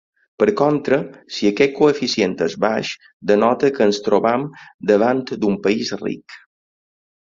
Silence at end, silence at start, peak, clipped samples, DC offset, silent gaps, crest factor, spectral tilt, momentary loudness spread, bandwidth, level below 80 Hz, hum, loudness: 1 s; 0.4 s; -2 dBFS; under 0.1%; under 0.1%; 3.13-3.20 s, 4.74-4.79 s; 18 dB; -5.5 dB/octave; 11 LU; 7.6 kHz; -58 dBFS; none; -18 LUFS